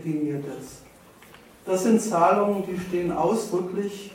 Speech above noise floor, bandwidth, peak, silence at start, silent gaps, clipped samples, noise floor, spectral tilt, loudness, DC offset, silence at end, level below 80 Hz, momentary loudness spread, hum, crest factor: 26 dB; 16.5 kHz; -6 dBFS; 0 s; none; under 0.1%; -50 dBFS; -6 dB/octave; -24 LUFS; under 0.1%; 0 s; -60 dBFS; 16 LU; none; 18 dB